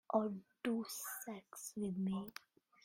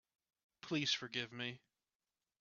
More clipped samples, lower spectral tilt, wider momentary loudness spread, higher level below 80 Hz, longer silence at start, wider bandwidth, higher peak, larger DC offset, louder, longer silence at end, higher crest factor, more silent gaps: neither; first, -5 dB/octave vs -2 dB/octave; second, 11 LU vs 18 LU; about the same, -80 dBFS vs -84 dBFS; second, 0.1 s vs 0.65 s; first, 16 kHz vs 7.2 kHz; about the same, -20 dBFS vs -22 dBFS; neither; second, -43 LUFS vs -40 LUFS; second, 0.55 s vs 0.85 s; about the same, 22 dB vs 22 dB; neither